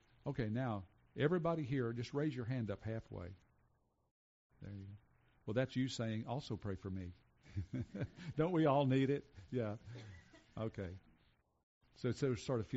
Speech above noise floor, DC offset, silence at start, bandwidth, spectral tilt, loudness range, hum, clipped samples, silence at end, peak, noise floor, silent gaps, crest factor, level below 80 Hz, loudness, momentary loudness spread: 38 dB; under 0.1%; 0.25 s; 7.6 kHz; -6.5 dB/octave; 7 LU; none; under 0.1%; 0 s; -22 dBFS; -78 dBFS; 4.11-4.50 s, 11.63-11.81 s; 18 dB; -66 dBFS; -40 LUFS; 19 LU